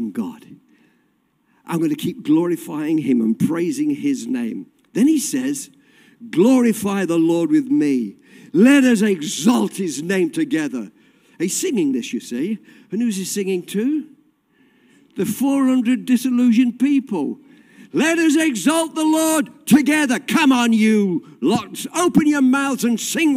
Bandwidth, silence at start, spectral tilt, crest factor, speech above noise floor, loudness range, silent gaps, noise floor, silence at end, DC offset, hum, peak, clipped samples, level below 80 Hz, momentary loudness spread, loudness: 16 kHz; 0 s; -4.5 dB/octave; 16 dB; 46 dB; 6 LU; none; -63 dBFS; 0 s; under 0.1%; none; -2 dBFS; under 0.1%; -64 dBFS; 11 LU; -18 LUFS